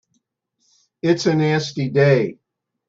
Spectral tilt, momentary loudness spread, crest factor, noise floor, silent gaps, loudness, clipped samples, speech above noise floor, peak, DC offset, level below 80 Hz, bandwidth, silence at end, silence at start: -6.5 dB/octave; 8 LU; 18 dB; -70 dBFS; none; -19 LUFS; under 0.1%; 53 dB; -2 dBFS; under 0.1%; -60 dBFS; 7.8 kHz; 0.55 s; 1.05 s